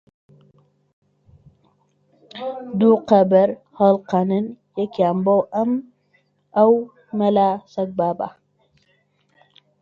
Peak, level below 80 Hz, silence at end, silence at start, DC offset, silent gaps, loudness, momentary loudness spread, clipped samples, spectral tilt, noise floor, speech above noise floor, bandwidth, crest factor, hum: 0 dBFS; -64 dBFS; 1.5 s; 2.35 s; under 0.1%; none; -19 LUFS; 14 LU; under 0.1%; -9 dB/octave; -64 dBFS; 46 dB; 7 kHz; 20 dB; none